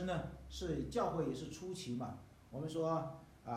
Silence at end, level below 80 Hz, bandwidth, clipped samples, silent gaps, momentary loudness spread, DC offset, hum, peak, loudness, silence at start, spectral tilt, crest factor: 0 s; -58 dBFS; 15 kHz; under 0.1%; none; 11 LU; under 0.1%; none; -24 dBFS; -42 LUFS; 0 s; -6 dB/octave; 16 dB